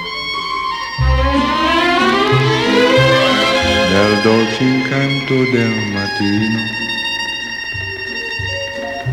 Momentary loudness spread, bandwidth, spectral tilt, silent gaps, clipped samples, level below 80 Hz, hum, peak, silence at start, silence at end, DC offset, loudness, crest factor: 9 LU; 16.5 kHz; -5 dB/octave; none; under 0.1%; -28 dBFS; none; 0 dBFS; 0 s; 0 s; under 0.1%; -14 LUFS; 14 dB